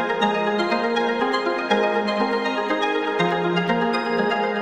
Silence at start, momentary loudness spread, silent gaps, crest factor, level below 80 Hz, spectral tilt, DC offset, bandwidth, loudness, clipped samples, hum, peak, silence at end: 0 s; 2 LU; none; 14 dB; -64 dBFS; -5.5 dB/octave; under 0.1%; 10.5 kHz; -21 LUFS; under 0.1%; none; -6 dBFS; 0 s